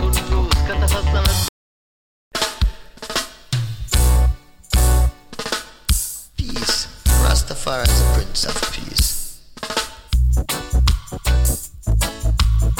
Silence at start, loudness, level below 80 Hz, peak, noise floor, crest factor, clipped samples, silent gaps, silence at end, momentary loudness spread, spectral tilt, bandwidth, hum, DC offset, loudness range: 0 s; -20 LUFS; -20 dBFS; -2 dBFS; under -90 dBFS; 16 dB; under 0.1%; 1.49-2.31 s; 0 s; 8 LU; -3.5 dB/octave; 17.5 kHz; none; under 0.1%; 3 LU